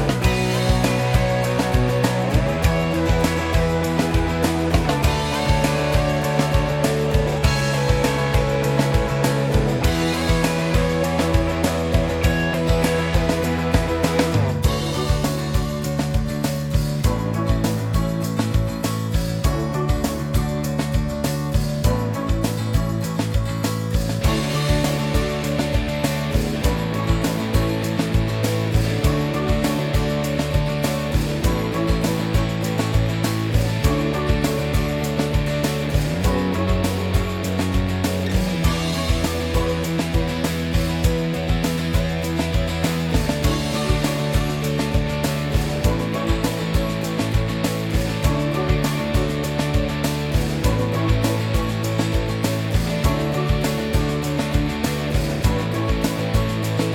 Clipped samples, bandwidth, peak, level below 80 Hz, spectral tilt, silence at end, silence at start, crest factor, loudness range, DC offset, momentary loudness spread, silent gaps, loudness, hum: under 0.1%; 17.5 kHz; -2 dBFS; -28 dBFS; -6 dB/octave; 0 s; 0 s; 18 dB; 3 LU; under 0.1%; 3 LU; none; -21 LUFS; none